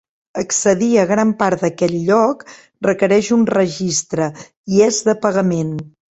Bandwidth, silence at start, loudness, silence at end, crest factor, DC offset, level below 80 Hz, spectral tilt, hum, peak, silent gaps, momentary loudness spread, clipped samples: 8.2 kHz; 0.35 s; -16 LUFS; 0.2 s; 16 dB; under 0.1%; -54 dBFS; -5 dB/octave; none; -2 dBFS; 4.57-4.64 s; 10 LU; under 0.1%